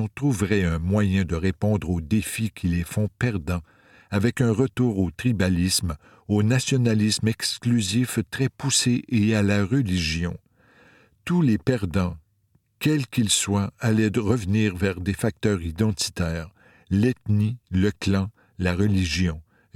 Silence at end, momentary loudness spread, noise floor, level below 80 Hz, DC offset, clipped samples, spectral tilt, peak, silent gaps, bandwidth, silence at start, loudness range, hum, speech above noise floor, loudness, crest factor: 0.35 s; 7 LU; -65 dBFS; -44 dBFS; under 0.1%; under 0.1%; -5 dB/octave; -6 dBFS; none; 16 kHz; 0 s; 3 LU; none; 43 dB; -24 LUFS; 18 dB